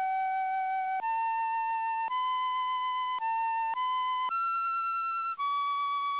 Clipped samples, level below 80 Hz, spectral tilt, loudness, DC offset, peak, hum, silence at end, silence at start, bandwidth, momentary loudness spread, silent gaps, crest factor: under 0.1%; -84 dBFS; 4.5 dB/octave; -31 LUFS; under 0.1%; -26 dBFS; none; 0 s; 0 s; 4 kHz; 1 LU; none; 6 dB